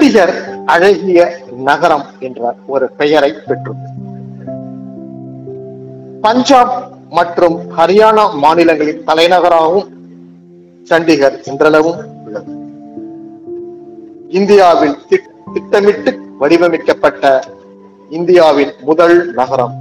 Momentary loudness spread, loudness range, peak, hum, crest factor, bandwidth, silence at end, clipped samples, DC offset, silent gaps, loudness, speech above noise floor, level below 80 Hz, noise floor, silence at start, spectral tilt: 21 LU; 7 LU; 0 dBFS; none; 12 dB; 12.5 kHz; 0 s; 2%; under 0.1%; none; -11 LUFS; 29 dB; -52 dBFS; -39 dBFS; 0 s; -5.5 dB/octave